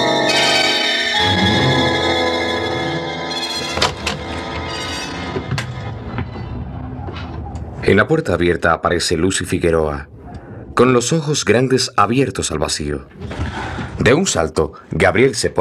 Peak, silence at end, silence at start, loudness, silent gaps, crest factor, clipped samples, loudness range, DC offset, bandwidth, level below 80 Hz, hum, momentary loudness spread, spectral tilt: 0 dBFS; 0 s; 0 s; -17 LUFS; none; 16 dB; under 0.1%; 7 LU; under 0.1%; 15 kHz; -38 dBFS; none; 15 LU; -4 dB/octave